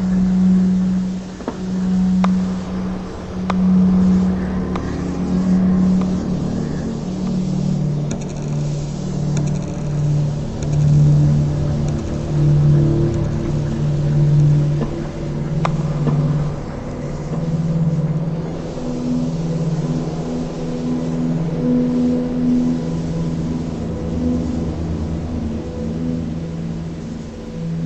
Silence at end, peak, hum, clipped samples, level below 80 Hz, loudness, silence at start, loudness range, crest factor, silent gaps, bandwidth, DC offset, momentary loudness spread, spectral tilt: 0 s; -2 dBFS; none; under 0.1%; -32 dBFS; -19 LUFS; 0 s; 5 LU; 16 dB; none; 8.2 kHz; under 0.1%; 11 LU; -8.5 dB/octave